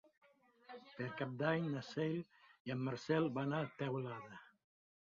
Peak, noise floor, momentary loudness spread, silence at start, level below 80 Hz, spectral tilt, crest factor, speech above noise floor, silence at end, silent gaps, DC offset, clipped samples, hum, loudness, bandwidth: -22 dBFS; -63 dBFS; 19 LU; 0.7 s; -80 dBFS; -6 dB/octave; 20 dB; 23 dB; 0.6 s; 2.60-2.65 s; under 0.1%; under 0.1%; none; -41 LUFS; 7.4 kHz